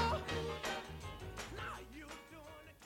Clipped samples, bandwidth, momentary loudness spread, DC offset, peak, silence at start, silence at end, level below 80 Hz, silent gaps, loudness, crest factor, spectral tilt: under 0.1%; 18.5 kHz; 14 LU; under 0.1%; -22 dBFS; 0 s; 0 s; -54 dBFS; none; -44 LUFS; 20 dB; -4.5 dB/octave